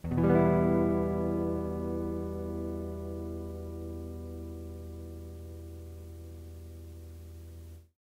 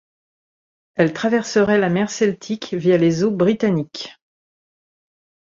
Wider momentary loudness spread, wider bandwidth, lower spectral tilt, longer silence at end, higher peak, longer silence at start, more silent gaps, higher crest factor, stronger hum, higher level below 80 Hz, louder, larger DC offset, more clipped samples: first, 21 LU vs 13 LU; first, 16 kHz vs 7.6 kHz; first, -9.5 dB/octave vs -6 dB/octave; second, 0.15 s vs 1.4 s; second, -10 dBFS vs -2 dBFS; second, 0.05 s vs 0.95 s; neither; about the same, 22 dB vs 18 dB; neither; first, -50 dBFS vs -58 dBFS; second, -32 LUFS vs -18 LUFS; neither; neither